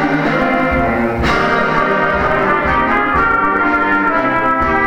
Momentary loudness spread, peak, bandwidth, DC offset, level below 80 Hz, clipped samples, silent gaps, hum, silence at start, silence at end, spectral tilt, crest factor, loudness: 2 LU; 0 dBFS; 16 kHz; under 0.1%; -30 dBFS; under 0.1%; none; none; 0 s; 0 s; -6.5 dB/octave; 12 dB; -13 LUFS